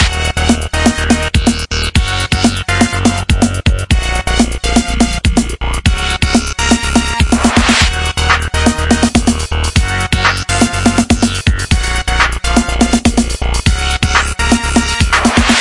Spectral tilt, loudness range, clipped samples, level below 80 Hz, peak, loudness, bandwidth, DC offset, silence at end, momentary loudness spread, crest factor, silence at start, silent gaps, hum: -4 dB/octave; 2 LU; under 0.1%; -18 dBFS; 0 dBFS; -12 LUFS; 11.5 kHz; under 0.1%; 0 s; 4 LU; 12 dB; 0 s; none; none